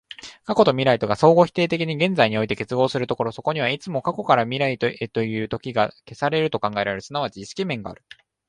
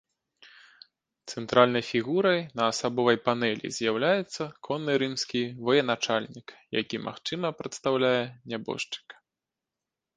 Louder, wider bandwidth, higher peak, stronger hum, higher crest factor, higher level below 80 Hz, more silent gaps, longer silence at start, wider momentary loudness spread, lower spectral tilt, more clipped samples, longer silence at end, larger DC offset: first, -22 LUFS vs -27 LUFS; about the same, 10.5 kHz vs 9.8 kHz; first, 0 dBFS vs -4 dBFS; neither; second, 20 dB vs 26 dB; first, -56 dBFS vs -68 dBFS; neither; second, 0.25 s vs 1.25 s; about the same, 10 LU vs 11 LU; first, -6 dB/octave vs -4.5 dB/octave; neither; second, 0.55 s vs 1.05 s; neither